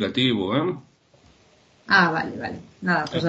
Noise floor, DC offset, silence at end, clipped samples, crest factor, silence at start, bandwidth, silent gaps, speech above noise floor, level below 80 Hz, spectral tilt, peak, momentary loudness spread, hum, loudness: -57 dBFS; under 0.1%; 0 s; under 0.1%; 20 dB; 0 s; 8.2 kHz; none; 34 dB; -60 dBFS; -6 dB/octave; -4 dBFS; 15 LU; none; -22 LUFS